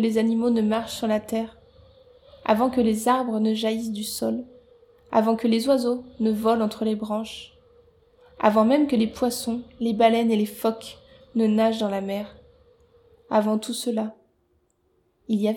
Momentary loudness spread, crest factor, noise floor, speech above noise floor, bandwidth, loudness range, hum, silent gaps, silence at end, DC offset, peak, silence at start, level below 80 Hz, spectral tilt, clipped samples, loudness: 11 LU; 20 dB; -67 dBFS; 45 dB; 18 kHz; 4 LU; none; none; 0 s; under 0.1%; -6 dBFS; 0 s; -58 dBFS; -5.5 dB/octave; under 0.1%; -24 LUFS